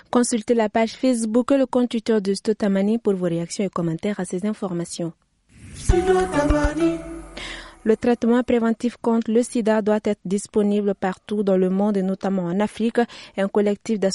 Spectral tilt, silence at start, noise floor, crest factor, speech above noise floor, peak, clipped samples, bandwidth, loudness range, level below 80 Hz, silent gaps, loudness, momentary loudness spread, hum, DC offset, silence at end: -6 dB/octave; 0.15 s; -46 dBFS; 16 dB; 26 dB; -6 dBFS; under 0.1%; 11.5 kHz; 3 LU; -36 dBFS; none; -22 LUFS; 8 LU; none; under 0.1%; 0 s